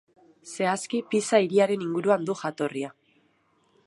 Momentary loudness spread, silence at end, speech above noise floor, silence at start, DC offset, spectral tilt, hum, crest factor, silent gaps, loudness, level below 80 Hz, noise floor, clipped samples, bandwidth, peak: 10 LU; 0.95 s; 42 dB; 0.45 s; under 0.1%; -5 dB/octave; none; 20 dB; none; -26 LUFS; -78 dBFS; -67 dBFS; under 0.1%; 11.5 kHz; -6 dBFS